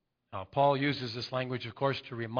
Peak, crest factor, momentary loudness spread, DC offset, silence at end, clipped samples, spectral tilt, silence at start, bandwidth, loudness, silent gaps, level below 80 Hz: -14 dBFS; 18 dB; 10 LU; under 0.1%; 0 s; under 0.1%; -7 dB/octave; 0.3 s; 5.2 kHz; -32 LUFS; none; -70 dBFS